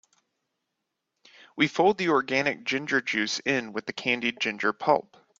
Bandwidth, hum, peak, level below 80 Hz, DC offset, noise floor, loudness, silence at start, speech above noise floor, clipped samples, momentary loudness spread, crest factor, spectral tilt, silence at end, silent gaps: 7.8 kHz; none; -6 dBFS; -72 dBFS; under 0.1%; -82 dBFS; -26 LUFS; 1.55 s; 56 dB; under 0.1%; 6 LU; 22 dB; -4 dB/octave; 0.4 s; none